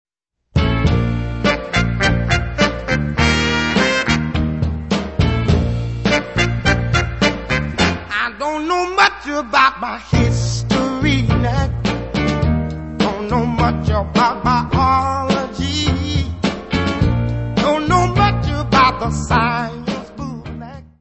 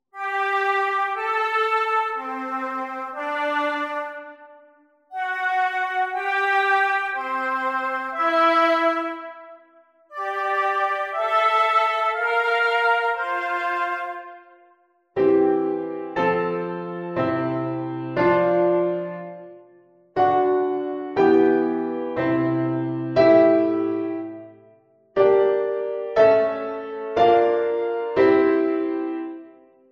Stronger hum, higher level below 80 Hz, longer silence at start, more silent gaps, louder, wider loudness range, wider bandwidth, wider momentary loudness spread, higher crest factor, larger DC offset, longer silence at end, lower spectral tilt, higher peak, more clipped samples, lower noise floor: neither; first, -26 dBFS vs -62 dBFS; first, 0.55 s vs 0.15 s; neither; first, -17 LUFS vs -21 LUFS; about the same, 2 LU vs 4 LU; about the same, 8.4 kHz vs 8.8 kHz; second, 7 LU vs 13 LU; about the same, 16 dB vs 18 dB; first, 0.2% vs under 0.1%; second, 0.15 s vs 0.4 s; about the same, -5.5 dB/octave vs -6.5 dB/octave; first, 0 dBFS vs -4 dBFS; neither; second, -48 dBFS vs -60 dBFS